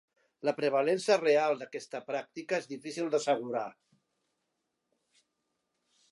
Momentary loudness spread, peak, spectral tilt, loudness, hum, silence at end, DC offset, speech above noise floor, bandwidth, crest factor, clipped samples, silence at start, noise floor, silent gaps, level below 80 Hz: 12 LU; -12 dBFS; -4 dB/octave; -31 LUFS; none; 2.4 s; under 0.1%; 52 dB; 11.5 kHz; 20 dB; under 0.1%; 0.45 s; -83 dBFS; none; -88 dBFS